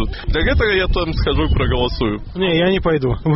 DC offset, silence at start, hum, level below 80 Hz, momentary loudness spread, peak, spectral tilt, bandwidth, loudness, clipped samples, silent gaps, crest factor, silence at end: under 0.1%; 0 s; none; -22 dBFS; 5 LU; -6 dBFS; -4.5 dB/octave; 5.8 kHz; -18 LUFS; under 0.1%; none; 12 dB; 0 s